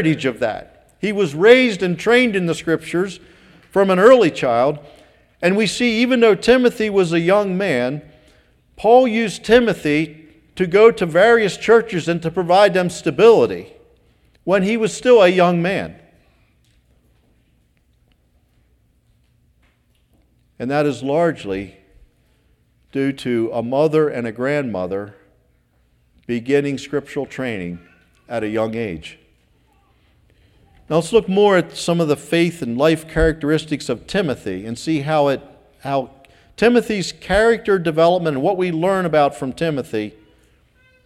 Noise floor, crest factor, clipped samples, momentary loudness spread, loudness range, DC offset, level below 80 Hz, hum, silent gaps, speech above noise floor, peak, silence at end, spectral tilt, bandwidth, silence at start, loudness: -59 dBFS; 18 dB; under 0.1%; 14 LU; 9 LU; under 0.1%; -44 dBFS; none; none; 43 dB; 0 dBFS; 0.95 s; -5.5 dB/octave; 13 kHz; 0 s; -17 LUFS